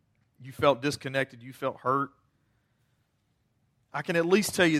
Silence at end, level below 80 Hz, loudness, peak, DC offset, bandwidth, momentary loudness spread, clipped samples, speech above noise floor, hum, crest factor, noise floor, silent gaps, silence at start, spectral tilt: 0 s; -68 dBFS; -28 LUFS; -8 dBFS; under 0.1%; 16 kHz; 12 LU; under 0.1%; 46 dB; none; 22 dB; -73 dBFS; none; 0.4 s; -4.5 dB/octave